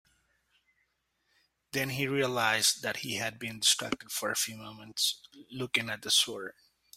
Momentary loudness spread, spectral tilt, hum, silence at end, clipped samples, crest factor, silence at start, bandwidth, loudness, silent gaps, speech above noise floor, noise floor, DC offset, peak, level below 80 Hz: 15 LU; -1.5 dB/octave; none; 0.45 s; under 0.1%; 24 dB; 1.75 s; 16 kHz; -29 LUFS; none; 45 dB; -77 dBFS; under 0.1%; -10 dBFS; -72 dBFS